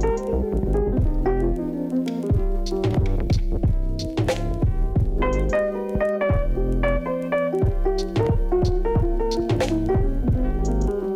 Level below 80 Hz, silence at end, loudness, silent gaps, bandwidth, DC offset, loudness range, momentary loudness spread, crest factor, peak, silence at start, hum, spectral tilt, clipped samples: -24 dBFS; 0 s; -23 LUFS; none; 10 kHz; under 0.1%; 1 LU; 3 LU; 12 dB; -10 dBFS; 0 s; none; -7.5 dB/octave; under 0.1%